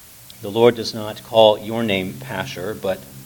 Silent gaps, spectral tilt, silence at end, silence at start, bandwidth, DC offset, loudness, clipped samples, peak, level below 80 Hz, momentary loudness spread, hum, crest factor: none; -5 dB/octave; 0 s; 0.3 s; 19 kHz; under 0.1%; -19 LUFS; under 0.1%; 0 dBFS; -58 dBFS; 13 LU; none; 20 dB